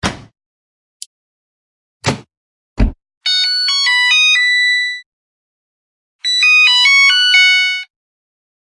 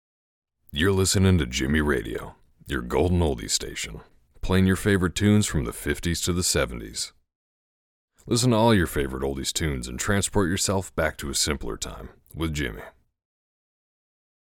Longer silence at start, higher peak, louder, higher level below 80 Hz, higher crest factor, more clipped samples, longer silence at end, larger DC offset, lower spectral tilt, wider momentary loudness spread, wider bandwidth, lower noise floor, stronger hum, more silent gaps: second, 0.05 s vs 0.7 s; first, 0 dBFS vs -8 dBFS; first, -10 LUFS vs -24 LUFS; first, -30 dBFS vs -40 dBFS; about the same, 14 dB vs 18 dB; neither; second, 0.85 s vs 1.55 s; neither; second, -1 dB/octave vs -4.5 dB/octave; about the same, 15 LU vs 13 LU; second, 11.5 kHz vs 17.5 kHz; about the same, under -90 dBFS vs under -90 dBFS; neither; first, 0.46-1.00 s, 1.06-2.00 s, 2.37-2.76 s, 3.17-3.21 s, 5.06-6.19 s vs 7.35-8.08 s